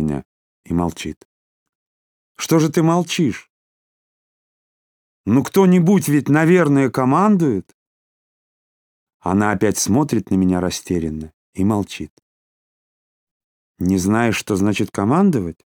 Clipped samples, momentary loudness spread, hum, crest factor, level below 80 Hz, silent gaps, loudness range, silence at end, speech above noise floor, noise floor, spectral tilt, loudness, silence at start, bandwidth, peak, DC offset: under 0.1%; 15 LU; none; 16 dB; -48 dBFS; 0.25-0.64 s, 1.17-1.66 s, 1.75-2.35 s, 3.50-5.24 s, 7.74-9.07 s, 9.14-9.20 s, 11.34-11.53 s, 12.10-13.74 s; 7 LU; 0.25 s; over 73 dB; under -90 dBFS; -6 dB/octave; -17 LUFS; 0 s; 19 kHz; -2 dBFS; under 0.1%